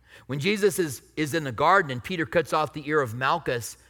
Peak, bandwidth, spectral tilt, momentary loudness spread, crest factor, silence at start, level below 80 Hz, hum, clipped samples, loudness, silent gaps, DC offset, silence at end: -6 dBFS; 19 kHz; -4.5 dB/octave; 9 LU; 18 dB; 0.15 s; -58 dBFS; none; under 0.1%; -25 LUFS; none; under 0.1%; 0.15 s